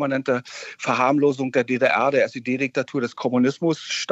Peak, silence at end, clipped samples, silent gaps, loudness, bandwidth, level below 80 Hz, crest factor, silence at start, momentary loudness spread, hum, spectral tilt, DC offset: -4 dBFS; 0 s; under 0.1%; none; -22 LUFS; 8.2 kHz; -76 dBFS; 16 dB; 0 s; 7 LU; none; -5 dB/octave; under 0.1%